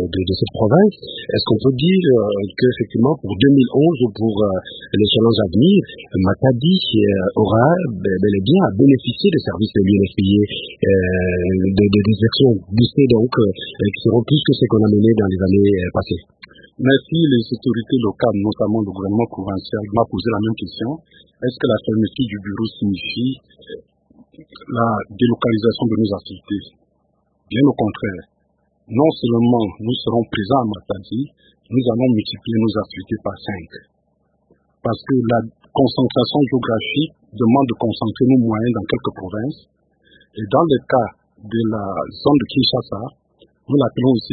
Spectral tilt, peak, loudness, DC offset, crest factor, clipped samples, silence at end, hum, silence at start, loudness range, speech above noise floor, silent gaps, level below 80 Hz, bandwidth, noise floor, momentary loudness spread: -12.5 dB/octave; 0 dBFS; -17 LUFS; under 0.1%; 18 dB; under 0.1%; 0 s; none; 0 s; 6 LU; 47 dB; none; -48 dBFS; 4.8 kHz; -64 dBFS; 12 LU